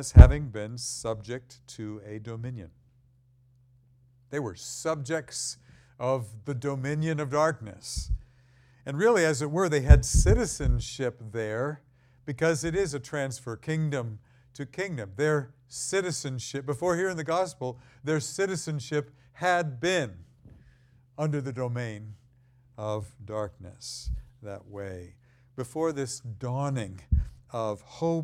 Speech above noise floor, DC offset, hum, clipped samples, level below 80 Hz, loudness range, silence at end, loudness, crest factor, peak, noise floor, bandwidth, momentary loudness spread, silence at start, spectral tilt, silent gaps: 36 dB; under 0.1%; none; under 0.1%; -32 dBFS; 13 LU; 0 s; -29 LUFS; 28 dB; 0 dBFS; -62 dBFS; 13.5 kHz; 15 LU; 0 s; -5.5 dB/octave; none